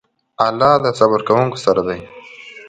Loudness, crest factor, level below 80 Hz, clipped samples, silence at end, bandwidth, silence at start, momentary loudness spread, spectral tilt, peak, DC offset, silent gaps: -15 LUFS; 16 dB; -52 dBFS; under 0.1%; 0 s; 9.2 kHz; 0.4 s; 21 LU; -6 dB/octave; 0 dBFS; under 0.1%; none